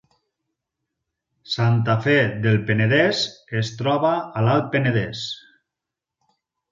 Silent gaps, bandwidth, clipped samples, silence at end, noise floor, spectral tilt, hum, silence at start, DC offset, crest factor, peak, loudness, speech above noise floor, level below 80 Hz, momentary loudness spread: none; 7.6 kHz; under 0.1%; 1.35 s; -86 dBFS; -6.5 dB/octave; none; 1.5 s; under 0.1%; 18 dB; -4 dBFS; -21 LUFS; 66 dB; -56 dBFS; 10 LU